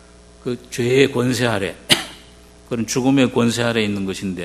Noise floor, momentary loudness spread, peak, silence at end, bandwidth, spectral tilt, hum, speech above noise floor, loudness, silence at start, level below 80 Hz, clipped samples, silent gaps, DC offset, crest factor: -45 dBFS; 13 LU; 0 dBFS; 0 s; 15 kHz; -4.5 dB/octave; none; 26 dB; -19 LUFS; 0.45 s; -48 dBFS; under 0.1%; none; under 0.1%; 20 dB